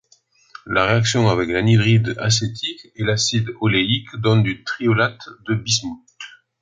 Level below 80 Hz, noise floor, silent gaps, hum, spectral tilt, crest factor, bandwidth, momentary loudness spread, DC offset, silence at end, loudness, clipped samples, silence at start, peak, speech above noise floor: -48 dBFS; -57 dBFS; none; none; -4.5 dB/octave; 18 dB; 9.4 kHz; 12 LU; under 0.1%; 0.35 s; -19 LUFS; under 0.1%; 0.65 s; -2 dBFS; 38 dB